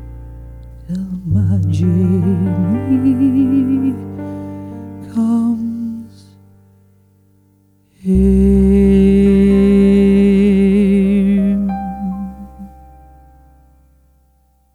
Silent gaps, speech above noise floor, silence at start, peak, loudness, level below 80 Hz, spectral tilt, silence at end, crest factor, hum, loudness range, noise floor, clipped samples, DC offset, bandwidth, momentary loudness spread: none; 42 dB; 0 s; -2 dBFS; -13 LUFS; -28 dBFS; -9.5 dB/octave; 2.05 s; 12 dB; none; 11 LU; -55 dBFS; under 0.1%; under 0.1%; 10 kHz; 18 LU